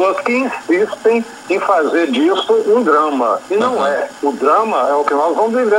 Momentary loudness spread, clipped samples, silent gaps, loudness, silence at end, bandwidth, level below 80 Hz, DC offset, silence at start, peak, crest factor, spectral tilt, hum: 5 LU; under 0.1%; none; -15 LUFS; 0 s; 13 kHz; -64 dBFS; under 0.1%; 0 s; -2 dBFS; 14 dB; -4.5 dB/octave; none